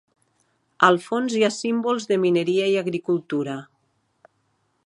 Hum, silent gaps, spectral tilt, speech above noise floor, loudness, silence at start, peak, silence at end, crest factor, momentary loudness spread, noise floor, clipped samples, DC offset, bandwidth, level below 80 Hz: none; none; -5 dB/octave; 48 dB; -22 LUFS; 0.8 s; -2 dBFS; 1.2 s; 22 dB; 9 LU; -69 dBFS; under 0.1%; under 0.1%; 11.5 kHz; -74 dBFS